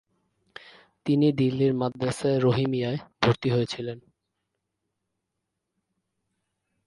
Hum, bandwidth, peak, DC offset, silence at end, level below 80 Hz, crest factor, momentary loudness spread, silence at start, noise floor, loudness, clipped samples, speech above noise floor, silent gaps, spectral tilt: none; 11.5 kHz; -6 dBFS; under 0.1%; 2.85 s; -60 dBFS; 22 dB; 11 LU; 1.05 s; -82 dBFS; -25 LUFS; under 0.1%; 58 dB; none; -7 dB/octave